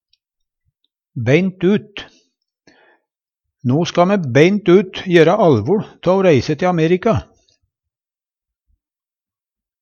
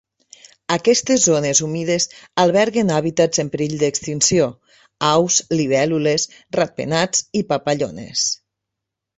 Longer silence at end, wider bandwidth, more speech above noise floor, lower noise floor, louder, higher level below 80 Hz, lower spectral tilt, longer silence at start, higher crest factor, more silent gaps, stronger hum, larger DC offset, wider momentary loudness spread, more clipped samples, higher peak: first, 2.6 s vs 0.8 s; second, 7 kHz vs 8.4 kHz; first, over 76 dB vs 64 dB; first, under -90 dBFS vs -82 dBFS; first, -15 LUFS vs -18 LUFS; first, -50 dBFS vs -56 dBFS; first, -7 dB/octave vs -3.5 dB/octave; first, 1.15 s vs 0.7 s; about the same, 18 dB vs 18 dB; neither; neither; neither; first, 10 LU vs 7 LU; neither; about the same, 0 dBFS vs -2 dBFS